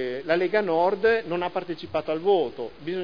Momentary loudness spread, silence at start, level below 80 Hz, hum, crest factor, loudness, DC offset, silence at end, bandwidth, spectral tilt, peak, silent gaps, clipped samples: 9 LU; 0 s; -60 dBFS; none; 16 dB; -25 LUFS; 0.4%; 0 s; 5.2 kHz; -7 dB/octave; -8 dBFS; none; under 0.1%